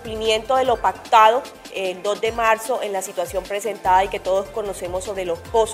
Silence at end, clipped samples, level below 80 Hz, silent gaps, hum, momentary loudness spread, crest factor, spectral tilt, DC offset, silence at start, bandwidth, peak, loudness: 0 s; under 0.1%; -44 dBFS; none; none; 11 LU; 20 dB; -3 dB/octave; under 0.1%; 0 s; 16 kHz; 0 dBFS; -20 LUFS